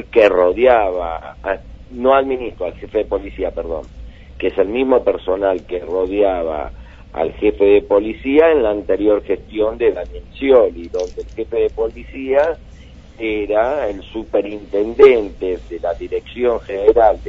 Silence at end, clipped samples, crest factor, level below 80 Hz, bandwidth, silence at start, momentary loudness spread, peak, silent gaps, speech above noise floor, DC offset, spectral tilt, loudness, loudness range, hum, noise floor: 0 s; under 0.1%; 16 dB; -38 dBFS; 6.8 kHz; 0 s; 14 LU; 0 dBFS; none; 23 dB; under 0.1%; -7 dB/octave; -17 LUFS; 4 LU; none; -39 dBFS